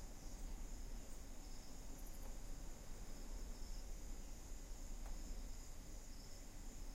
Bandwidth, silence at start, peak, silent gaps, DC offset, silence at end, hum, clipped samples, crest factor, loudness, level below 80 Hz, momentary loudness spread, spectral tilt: 16.5 kHz; 0 s; -38 dBFS; none; under 0.1%; 0 s; none; under 0.1%; 12 dB; -56 LUFS; -50 dBFS; 3 LU; -4 dB/octave